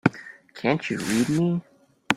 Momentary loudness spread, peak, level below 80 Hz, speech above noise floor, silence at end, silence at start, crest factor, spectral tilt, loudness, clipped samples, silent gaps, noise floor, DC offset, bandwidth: 14 LU; 0 dBFS; -60 dBFS; 21 dB; 0 s; 0.05 s; 24 dB; -5.5 dB/octave; -25 LUFS; under 0.1%; none; -44 dBFS; under 0.1%; 15.5 kHz